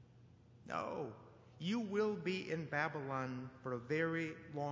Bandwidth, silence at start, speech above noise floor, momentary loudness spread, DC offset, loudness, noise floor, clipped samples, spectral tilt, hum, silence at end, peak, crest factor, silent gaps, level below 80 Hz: 7.6 kHz; 0 s; 23 dB; 9 LU; under 0.1%; -41 LUFS; -63 dBFS; under 0.1%; -6.5 dB/octave; none; 0 s; -22 dBFS; 20 dB; none; -74 dBFS